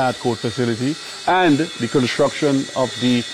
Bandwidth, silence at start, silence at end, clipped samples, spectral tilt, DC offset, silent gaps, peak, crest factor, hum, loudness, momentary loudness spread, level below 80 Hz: 13.5 kHz; 0 s; 0 s; under 0.1%; -5 dB/octave; under 0.1%; none; -6 dBFS; 12 dB; none; -19 LUFS; 6 LU; -58 dBFS